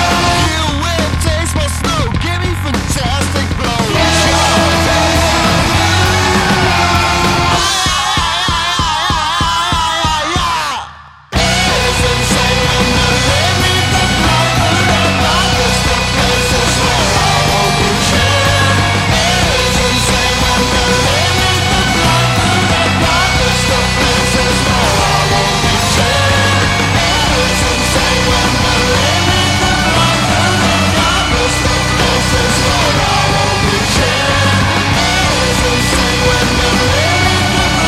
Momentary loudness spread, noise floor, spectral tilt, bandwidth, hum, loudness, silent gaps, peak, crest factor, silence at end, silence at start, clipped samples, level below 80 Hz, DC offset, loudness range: 4 LU; -33 dBFS; -3.5 dB/octave; 16 kHz; none; -11 LUFS; none; 0 dBFS; 12 dB; 0 s; 0 s; under 0.1%; -22 dBFS; under 0.1%; 2 LU